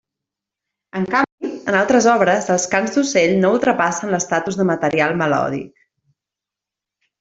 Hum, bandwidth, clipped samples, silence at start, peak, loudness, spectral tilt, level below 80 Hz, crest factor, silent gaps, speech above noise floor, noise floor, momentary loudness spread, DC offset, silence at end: none; 8 kHz; under 0.1%; 0.95 s; 0 dBFS; -17 LUFS; -4.5 dB/octave; -58 dBFS; 18 dB; 1.32-1.38 s; 70 dB; -86 dBFS; 10 LU; under 0.1%; 1.55 s